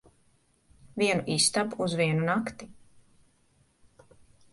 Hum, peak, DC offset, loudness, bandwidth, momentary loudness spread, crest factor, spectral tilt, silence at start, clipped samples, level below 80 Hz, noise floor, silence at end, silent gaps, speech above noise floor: none; -10 dBFS; under 0.1%; -27 LUFS; 11.5 kHz; 15 LU; 22 dB; -3.5 dB/octave; 0.95 s; under 0.1%; -64 dBFS; -67 dBFS; 1.8 s; none; 39 dB